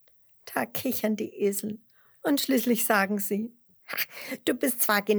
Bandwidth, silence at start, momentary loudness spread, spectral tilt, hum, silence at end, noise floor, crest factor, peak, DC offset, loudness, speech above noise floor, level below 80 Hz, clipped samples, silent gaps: over 20 kHz; 0.45 s; 11 LU; -3.5 dB/octave; none; 0 s; -52 dBFS; 20 dB; -8 dBFS; under 0.1%; -27 LUFS; 25 dB; -78 dBFS; under 0.1%; none